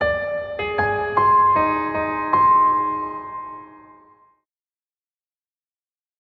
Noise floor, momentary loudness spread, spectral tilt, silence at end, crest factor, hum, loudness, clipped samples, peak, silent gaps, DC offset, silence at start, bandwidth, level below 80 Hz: under -90 dBFS; 17 LU; -8 dB/octave; 2.45 s; 18 dB; none; -19 LUFS; under 0.1%; -4 dBFS; none; under 0.1%; 0 s; 5.2 kHz; -50 dBFS